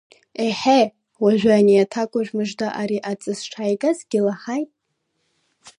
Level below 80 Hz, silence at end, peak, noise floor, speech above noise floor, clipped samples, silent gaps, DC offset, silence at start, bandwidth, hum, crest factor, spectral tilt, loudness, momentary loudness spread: -64 dBFS; 0.1 s; -4 dBFS; -73 dBFS; 54 dB; under 0.1%; none; under 0.1%; 0.4 s; 11 kHz; none; 16 dB; -5.5 dB/octave; -20 LUFS; 12 LU